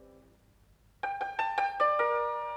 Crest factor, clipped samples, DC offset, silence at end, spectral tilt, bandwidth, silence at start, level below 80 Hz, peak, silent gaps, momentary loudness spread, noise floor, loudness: 18 dB; under 0.1%; under 0.1%; 0 s; -3.5 dB/octave; 11 kHz; 0 s; -66 dBFS; -16 dBFS; none; 10 LU; -63 dBFS; -30 LUFS